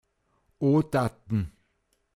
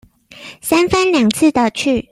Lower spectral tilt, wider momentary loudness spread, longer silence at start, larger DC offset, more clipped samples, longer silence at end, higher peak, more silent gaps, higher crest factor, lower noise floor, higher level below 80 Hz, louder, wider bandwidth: first, -8.5 dB/octave vs -4 dB/octave; about the same, 7 LU vs 9 LU; first, 0.6 s vs 0.4 s; neither; neither; first, 0.65 s vs 0.1 s; second, -12 dBFS vs 0 dBFS; neither; about the same, 16 dB vs 14 dB; first, -73 dBFS vs -38 dBFS; second, -52 dBFS vs -44 dBFS; second, -27 LUFS vs -14 LUFS; second, 13.5 kHz vs 15.5 kHz